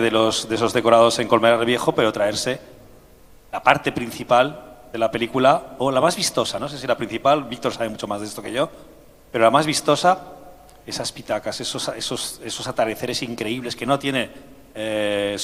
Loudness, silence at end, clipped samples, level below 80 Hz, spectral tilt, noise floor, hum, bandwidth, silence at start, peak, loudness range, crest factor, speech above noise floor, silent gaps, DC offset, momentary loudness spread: -21 LUFS; 0 s; under 0.1%; -54 dBFS; -4 dB/octave; -48 dBFS; none; 16 kHz; 0 s; 0 dBFS; 6 LU; 22 dB; 27 dB; none; under 0.1%; 11 LU